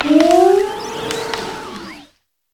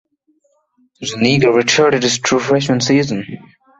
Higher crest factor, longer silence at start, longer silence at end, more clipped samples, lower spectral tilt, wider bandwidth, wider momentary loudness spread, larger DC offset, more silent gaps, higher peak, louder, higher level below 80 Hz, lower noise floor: about the same, 16 dB vs 16 dB; second, 0 s vs 1 s; first, 0.55 s vs 0.4 s; neither; about the same, -4 dB/octave vs -4 dB/octave; first, 17 kHz vs 8.2 kHz; first, 20 LU vs 14 LU; neither; neither; about the same, 0 dBFS vs -2 dBFS; about the same, -15 LUFS vs -14 LUFS; about the same, -50 dBFS vs -52 dBFS; second, -53 dBFS vs -61 dBFS